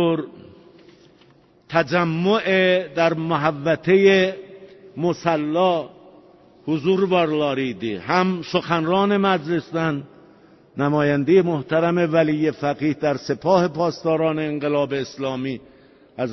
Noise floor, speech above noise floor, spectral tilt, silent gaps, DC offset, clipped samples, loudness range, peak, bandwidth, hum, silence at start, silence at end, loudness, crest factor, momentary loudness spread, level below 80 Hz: -54 dBFS; 34 dB; -7 dB/octave; none; under 0.1%; under 0.1%; 3 LU; -2 dBFS; 6.2 kHz; none; 0 s; 0 s; -20 LUFS; 18 dB; 10 LU; -60 dBFS